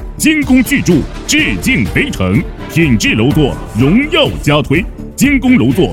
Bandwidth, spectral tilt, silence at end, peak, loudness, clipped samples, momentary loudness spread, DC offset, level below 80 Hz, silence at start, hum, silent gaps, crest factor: 17.5 kHz; -5 dB/octave; 0 s; 0 dBFS; -11 LUFS; 0.1%; 5 LU; under 0.1%; -26 dBFS; 0 s; none; none; 12 dB